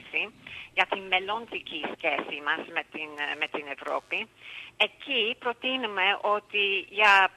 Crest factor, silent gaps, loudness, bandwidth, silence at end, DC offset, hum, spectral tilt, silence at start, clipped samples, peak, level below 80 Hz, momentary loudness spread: 22 dB; none; -27 LUFS; 15 kHz; 0.05 s; under 0.1%; none; -2.5 dB/octave; 0 s; under 0.1%; -6 dBFS; -72 dBFS; 10 LU